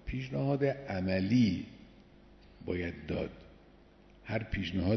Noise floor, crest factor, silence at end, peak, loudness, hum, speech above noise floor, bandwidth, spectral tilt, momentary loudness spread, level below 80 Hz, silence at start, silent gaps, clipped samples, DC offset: -59 dBFS; 16 dB; 0 s; -18 dBFS; -33 LUFS; 50 Hz at -60 dBFS; 27 dB; 6.4 kHz; -8 dB/octave; 18 LU; -52 dBFS; 0.05 s; none; under 0.1%; under 0.1%